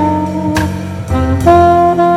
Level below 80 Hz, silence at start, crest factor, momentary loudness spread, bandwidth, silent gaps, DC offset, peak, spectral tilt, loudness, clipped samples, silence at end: -30 dBFS; 0 s; 10 dB; 11 LU; 15.5 kHz; none; under 0.1%; 0 dBFS; -7.5 dB/octave; -11 LUFS; 0.2%; 0 s